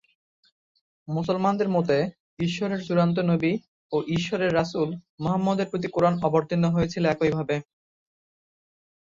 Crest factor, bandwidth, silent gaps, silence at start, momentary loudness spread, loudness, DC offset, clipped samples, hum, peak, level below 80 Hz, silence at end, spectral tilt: 18 dB; 7.6 kHz; 2.20-2.37 s, 3.68-3.90 s, 5.10-5.18 s; 1.1 s; 8 LU; -25 LUFS; under 0.1%; under 0.1%; none; -8 dBFS; -56 dBFS; 1.5 s; -7 dB/octave